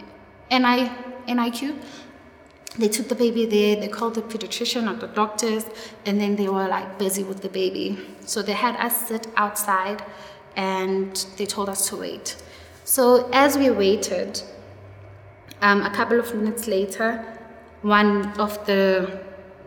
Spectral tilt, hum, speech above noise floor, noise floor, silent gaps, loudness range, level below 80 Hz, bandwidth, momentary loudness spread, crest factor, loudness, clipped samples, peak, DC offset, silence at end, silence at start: -3.5 dB/octave; none; 26 dB; -48 dBFS; none; 4 LU; -62 dBFS; over 20 kHz; 15 LU; 20 dB; -22 LUFS; under 0.1%; -4 dBFS; under 0.1%; 0.05 s; 0 s